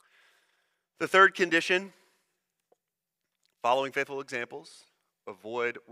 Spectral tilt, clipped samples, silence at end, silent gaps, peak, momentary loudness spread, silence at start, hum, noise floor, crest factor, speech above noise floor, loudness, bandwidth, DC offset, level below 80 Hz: -3.5 dB/octave; under 0.1%; 0.1 s; none; -8 dBFS; 24 LU; 1 s; none; -87 dBFS; 24 dB; 59 dB; -27 LUFS; 15 kHz; under 0.1%; -82 dBFS